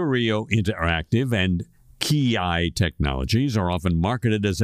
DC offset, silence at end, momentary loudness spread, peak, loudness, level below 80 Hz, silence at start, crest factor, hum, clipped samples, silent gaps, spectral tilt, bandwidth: under 0.1%; 0 s; 3 LU; -4 dBFS; -23 LUFS; -36 dBFS; 0 s; 18 dB; none; under 0.1%; none; -6 dB/octave; 15.5 kHz